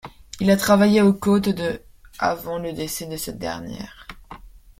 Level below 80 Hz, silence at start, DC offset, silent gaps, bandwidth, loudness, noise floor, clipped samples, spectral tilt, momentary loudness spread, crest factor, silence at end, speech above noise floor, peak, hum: -48 dBFS; 0.05 s; under 0.1%; none; 16.5 kHz; -21 LUFS; -42 dBFS; under 0.1%; -5.5 dB/octave; 20 LU; 18 dB; 0.2 s; 22 dB; -4 dBFS; none